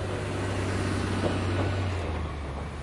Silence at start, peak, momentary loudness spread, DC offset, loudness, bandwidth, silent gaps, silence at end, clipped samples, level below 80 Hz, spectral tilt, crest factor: 0 s; -14 dBFS; 6 LU; under 0.1%; -30 LUFS; 11.5 kHz; none; 0 s; under 0.1%; -40 dBFS; -6 dB/octave; 14 dB